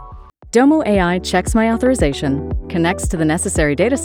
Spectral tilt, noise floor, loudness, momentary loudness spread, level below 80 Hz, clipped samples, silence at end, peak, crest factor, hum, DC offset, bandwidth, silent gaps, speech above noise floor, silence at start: -5.5 dB/octave; -37 dBFS; -16 LUFS; 7 LU; -28 dBFS; under 0.1%; 0 s; -2 dBFS; 14 dB; none; under 0.1%; 16.5 kHz; none; 22 dB; 0 s